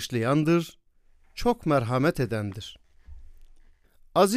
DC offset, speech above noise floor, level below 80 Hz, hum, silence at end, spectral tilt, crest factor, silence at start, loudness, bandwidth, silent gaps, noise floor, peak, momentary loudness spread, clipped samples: under 0.1%; 34 dB; -48 dBFS; none; 0 s; -6 dB/octave; 20 dB; 0 s; -26 LUFS; 15.5 kHz; none; -59 dBFS; -6 dBFS; 17 LU; under 0.1%